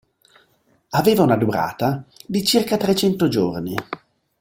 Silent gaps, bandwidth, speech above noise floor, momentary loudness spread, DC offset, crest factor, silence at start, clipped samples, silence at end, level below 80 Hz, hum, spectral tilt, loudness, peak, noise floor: none; 17 kHz; 42 dB; 12 LU; under 0.1%; 18 dB; 0.9 s; under 0.1%; 0.45 s; -54 dBFS; none; -5.5 dB/octave; -20 LUFS; -2 dBFS; -61 dBFS